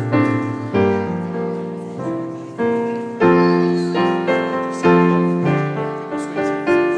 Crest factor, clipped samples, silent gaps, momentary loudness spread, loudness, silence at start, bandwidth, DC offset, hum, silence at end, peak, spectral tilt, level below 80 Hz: 16 dB; under 0.1%; none; 11 LU; -18 LUFS; 0 s; 10 kHz; under 0.1%; none; 0 s; -2 dBFS; -7.5 dB/octave; -56 dBFS